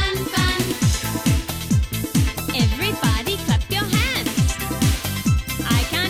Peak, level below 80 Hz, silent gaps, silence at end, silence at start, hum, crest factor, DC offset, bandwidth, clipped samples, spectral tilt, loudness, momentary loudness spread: -8 dBFS; -28 dBFS; none; 0 s; 0 s; none; 12 dB; under 0.1%; 17.5 kHz; under 0.1%; -4.5 dB/octave; -21 LUFS; 3 LU